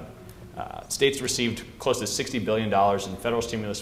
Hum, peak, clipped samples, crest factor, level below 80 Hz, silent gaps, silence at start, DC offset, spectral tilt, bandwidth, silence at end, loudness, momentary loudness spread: none; -8 dBFS; under 0.1%; 20 dB; -50 dBFS; none; 0 s; under 0.1%; -3.5 dB/octave; 16 kHz; 0 s; -26 LUFS; 15 LU